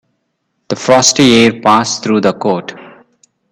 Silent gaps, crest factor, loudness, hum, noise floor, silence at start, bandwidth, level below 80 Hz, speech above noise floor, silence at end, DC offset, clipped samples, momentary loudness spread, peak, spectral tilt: none; 12 dB; -10 LUFS; none; -67 dBFS; 0.7 s; 18.5 kHz; -50 dBFS; 56 dB; 0.65 s; under 0.1%; under 0.1%; 12 LU; 0 dBFS; -3.5 dB/octave